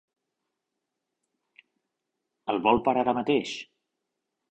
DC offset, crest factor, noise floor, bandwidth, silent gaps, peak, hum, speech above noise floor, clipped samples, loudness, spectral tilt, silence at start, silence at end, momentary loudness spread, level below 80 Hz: under 0.1%; 22 dB; -84 dBFS; 8.6 kHz; none; -8 dBFS; none; 59 dB; under 0.1%; -26 LUFS; -5.5 dB/octave; 2.45 s; 0.85 s; 15 LU; -60 dBFS